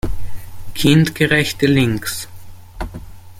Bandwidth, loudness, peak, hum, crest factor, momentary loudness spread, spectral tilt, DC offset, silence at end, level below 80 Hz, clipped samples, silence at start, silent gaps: 16.5 kHz; -16 LUFS; 0 dBFS; none; 16 dB; 21 LU; -5 dB/octave; under 0.1%; 0 s; -34 dBFS; under 0.1%; 0.05 s; none